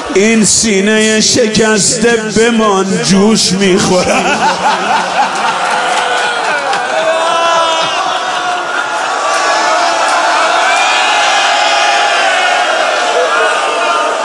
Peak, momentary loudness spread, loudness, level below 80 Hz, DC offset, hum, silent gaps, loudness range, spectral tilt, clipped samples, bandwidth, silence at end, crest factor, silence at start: 0 dBFS; 5 LU; -10 LUFS; -46 dBFS; under 0.1%; none; none; 3 LU; -2.5 dB/octave; under 0.1%; 11.5 kHz; 0 s; 10 dB; 0 s